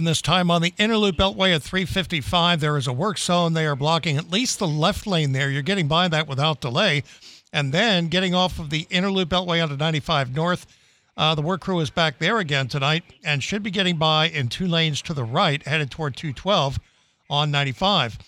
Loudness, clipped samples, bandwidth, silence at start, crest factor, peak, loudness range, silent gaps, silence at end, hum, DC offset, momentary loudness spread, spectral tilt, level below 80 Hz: -21 LUFS; under 0.1%; 15 kHz; 0 s; 16 dB; -6 dBFS; 2 LU; none; 0.1 s; none; under 0.1%; 6 LU; -4.5 dB/octave; -46 dBFS